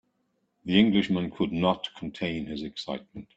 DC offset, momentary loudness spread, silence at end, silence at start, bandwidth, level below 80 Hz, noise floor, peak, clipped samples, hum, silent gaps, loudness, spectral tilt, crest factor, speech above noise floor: under 0.1%; 14 LU; 0.15 s; 0.65 s; 8 kHz; -58 dBFS; -74 dBFS; -6 dBFS; under 0.1%; none; none; -27 LUFS; -7 dB/octave; 22 dB; 47 dB